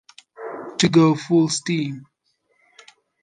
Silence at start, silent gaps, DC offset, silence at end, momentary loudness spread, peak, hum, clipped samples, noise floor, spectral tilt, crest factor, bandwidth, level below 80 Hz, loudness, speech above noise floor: 0.4 s; none; under 0.1%; 1.2 s; 20 LU; -4 dBFS; none; under 0.1%; -67 dBFS; -5 dB/octave; 18 dB; 9.8 kHz; -64 dBFS; -19 LUFS; 49 dB